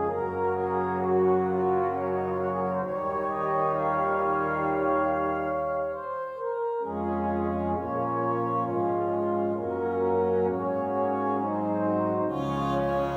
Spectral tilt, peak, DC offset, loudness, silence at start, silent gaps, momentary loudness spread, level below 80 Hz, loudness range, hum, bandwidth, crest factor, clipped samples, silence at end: -9 dB/octave; -14 dBFS; under 0.1%; -27 LUFS; 0 s; none; 4 LU; -54 dBFS; 2 LU; none; 7.4 kHz; 12 dB; under 0.1%; 0 s